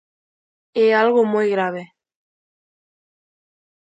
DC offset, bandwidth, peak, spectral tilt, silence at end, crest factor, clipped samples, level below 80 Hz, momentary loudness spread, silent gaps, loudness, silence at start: under 0.1%; 8 kHz; -4 dBFS; -6.5 dB/octave; 2.05 s; 18 dB; under 0.1%; -74 dBFS; 12 LU; none; -18 LUFS; 0.75 s